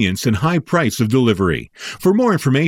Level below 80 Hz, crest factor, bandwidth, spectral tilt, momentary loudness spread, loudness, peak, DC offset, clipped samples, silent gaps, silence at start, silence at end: -44 dBFS; 14 dB; 17 kHz; -6 dB/octave; 5 LU; -17 LUFS; -2 dBFS; under 0.1%; under 0.1%; none; 0 s; 0 s